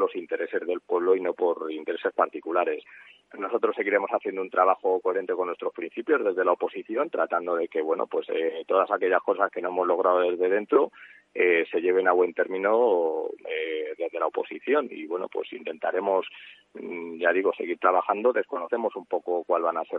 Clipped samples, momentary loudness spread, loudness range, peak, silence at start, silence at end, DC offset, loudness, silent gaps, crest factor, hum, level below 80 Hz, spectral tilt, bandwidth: under 0.1%; 10 LU; 4 LU; -6 dBFS; 0 s; 0 s; under 0.1%; -26 LUFS; none; 20 dB; none; -82 dBFS; -7 dB/octave; 4 kHz